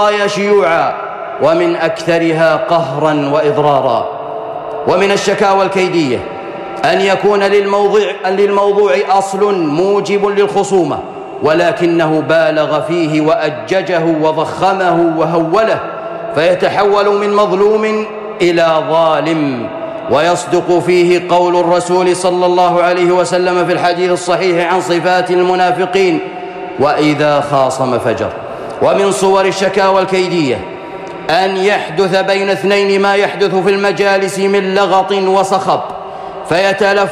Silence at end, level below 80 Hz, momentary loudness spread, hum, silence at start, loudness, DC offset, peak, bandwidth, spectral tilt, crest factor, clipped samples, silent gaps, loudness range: 0 s; -52 dBFS; 8 LU; none; 0 s; -12 LUFS; under 0.1%; -2 dBFS; 13 kHz; -5 dB/octave; 10 dB; under 0.1%; none; 2 LU